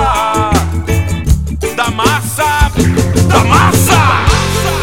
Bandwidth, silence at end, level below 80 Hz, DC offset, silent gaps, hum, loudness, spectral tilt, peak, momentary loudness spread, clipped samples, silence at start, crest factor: 17.5 kHz; 0 s; -20 dBFS; 2%; none; none; -11 LUFS; -4.5 dB/octave; 0 dBFS; 7 LU; 0.2%; 0 s; 10 dB